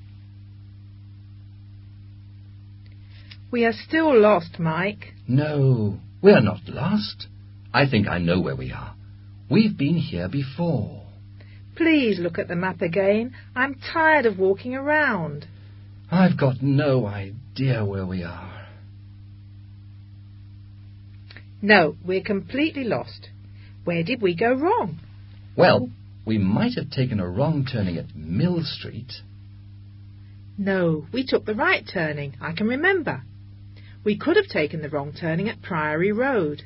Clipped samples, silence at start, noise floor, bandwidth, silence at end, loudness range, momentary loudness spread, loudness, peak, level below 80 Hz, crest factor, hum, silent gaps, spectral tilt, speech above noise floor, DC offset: under 0.1%; 0 s; -43 dBFS; 5.8 kHz; 0 s; 7 LU; 17 LU; -22 LUFS; -2 dBFS; -48 dBFS; 22 dB; 50 Hz at -45 dBFS; none; -11.5 dB/octave; 21 dB; under 0.1%